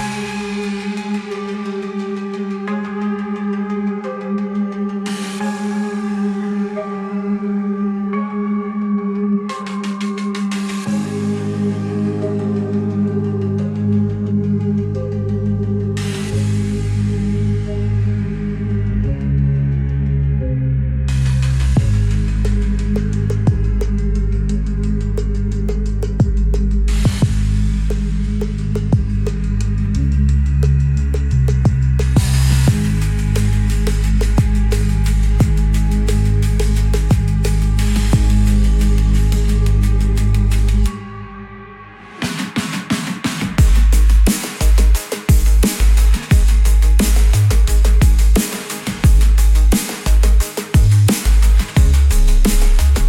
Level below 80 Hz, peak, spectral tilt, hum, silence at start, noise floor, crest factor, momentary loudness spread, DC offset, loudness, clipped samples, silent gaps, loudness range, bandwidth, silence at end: -16 dBFS; -2 dBFS; -6.5 dB/octave; none; 0 s; -36 dBFS; 12 dB; 9 LU; under 0.1%; -17 LUFS; under 0.1%; none; 7 LU; 16 kHz; 0 s